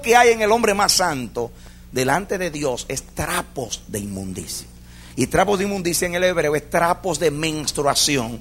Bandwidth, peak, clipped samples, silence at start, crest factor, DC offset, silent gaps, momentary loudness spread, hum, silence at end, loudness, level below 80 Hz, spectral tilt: 16 kHz; 0 dBFS; under 0.1%; 0 s; 20 dB; under 0.1%; none; 13 LU; 60 Hz at -45 dBFS; 0 s; -20 LUFS; -42 dBFS; -3 dB/octave